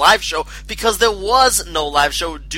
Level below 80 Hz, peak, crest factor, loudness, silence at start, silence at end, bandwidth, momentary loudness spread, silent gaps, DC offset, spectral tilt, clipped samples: -34 dBFS; 0 dBFS; 16 dB; -16 LUFS; 0 s; 0 s; 16.5 kHz; 10 LU; none; under 0.1%; -1 dB/octave; under 0.1%